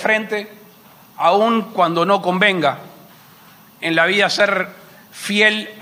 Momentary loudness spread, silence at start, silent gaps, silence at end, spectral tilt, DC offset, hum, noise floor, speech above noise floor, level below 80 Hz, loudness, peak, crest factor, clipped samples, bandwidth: 12 LU; 0 s; none; 0 s; -4 dB/octave; under 0.1%; none; -46 dBFS; 29 dB; -72 dBFS; -16 LUFS; 0 dBFS; 18 dB; under 0.1%; 15.5 kHz